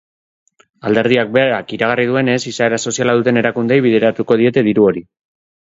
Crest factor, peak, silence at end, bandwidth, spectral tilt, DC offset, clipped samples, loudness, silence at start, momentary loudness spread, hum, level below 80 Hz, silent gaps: 16 dB; 0 dBFS; 0.8 s; 7.8 kHz; -5 dB/octave; under 0.1%; under 0.1%; -14 LUFS; 0.85 s; 5 LU; none; -56 dBFS; none